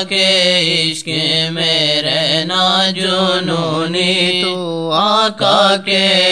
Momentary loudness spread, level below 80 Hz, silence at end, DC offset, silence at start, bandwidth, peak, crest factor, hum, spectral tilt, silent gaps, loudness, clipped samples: 6 LU; -62 dBFS; 0 s; 0.4%; 0 s; 11 kHz; 0 dBFS; 14 dB; none; -3.5 dB/octave; none; -13 LUFS; under 0.1%